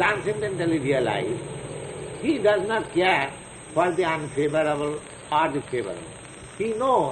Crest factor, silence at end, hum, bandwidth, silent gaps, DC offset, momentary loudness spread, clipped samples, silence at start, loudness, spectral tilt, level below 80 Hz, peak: 16 dB; 0 s; none; 11 kHz; none; under 0.1%; 13 LU; under 0.1%; 0 s; -25 LUFS; -5 dB/octave; -54 dBFS; -8 dBFS